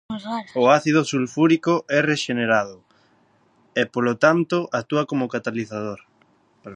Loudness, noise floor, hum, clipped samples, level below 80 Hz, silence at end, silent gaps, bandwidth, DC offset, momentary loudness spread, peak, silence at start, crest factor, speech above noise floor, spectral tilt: -21 LUFS; -60 dBFS; none; under 0.1%; -66 dBFS; 0 s; none; 10 kHz; under 0.1%; 12 LU; -2 dBFS; 0.1 s; 20 dB; 39 dB; -5.5 dB/octave